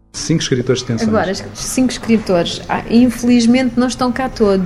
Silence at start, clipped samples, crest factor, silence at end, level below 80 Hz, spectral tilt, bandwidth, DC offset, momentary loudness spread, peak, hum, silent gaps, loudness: 0.15 s; under 0.1%; 14 dB; 0 s; -38 dBFS; -5 dB/octave; 13.5 kHz; under 0.1%; 7 LU; 0 dBFS; none; none; -15 LUFS